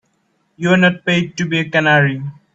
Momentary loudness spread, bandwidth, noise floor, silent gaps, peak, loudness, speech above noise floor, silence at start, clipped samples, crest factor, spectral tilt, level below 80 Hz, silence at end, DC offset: 7 LU; 7.8 kHz; -64 dBFS; none; 0 dBFS; -15 LUFS; 48 dB; 0.6 s; under 0.1%; 16 dB; -6 dB/octave; -56 dBFS; 0.2 s; under 0.1%